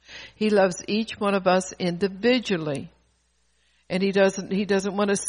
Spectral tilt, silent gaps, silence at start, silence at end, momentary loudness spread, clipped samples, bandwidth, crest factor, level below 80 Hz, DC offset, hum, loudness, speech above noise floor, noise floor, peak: -5 dB/octave; none; 0.1 s; 0 s; 8 LU; under 0.1%; 10.5 kHz; 18 dB; -60 dBFS; under 0.1%; none; -24 LUFS; 44 dB; -67 dBFS; -8 dBFS